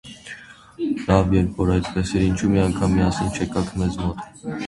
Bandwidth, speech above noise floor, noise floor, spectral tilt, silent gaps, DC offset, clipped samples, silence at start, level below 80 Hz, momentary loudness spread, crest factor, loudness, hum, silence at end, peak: 11.5 kHz; 20 dB; -41 dBFS; -6.5 dB/octave; none; under 0.1%; under 0.1%; 0.05 s; -34 dBFS; 14 LU; 18 dB; -21 LUFS; none; 0 s; -2 dBFS